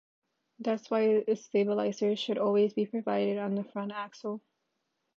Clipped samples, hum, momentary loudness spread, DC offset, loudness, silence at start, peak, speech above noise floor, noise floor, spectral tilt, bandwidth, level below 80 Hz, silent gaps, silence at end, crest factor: under 0.1%; none; 11 LU; under 0.1%; -30 LUFS; 0.6 s; -16 dBFS; 51 dB; -81 dBFS; -6.5 dB/octave; 7.2 kHz; -84 dBFS; none; 0.8 s; 14 dB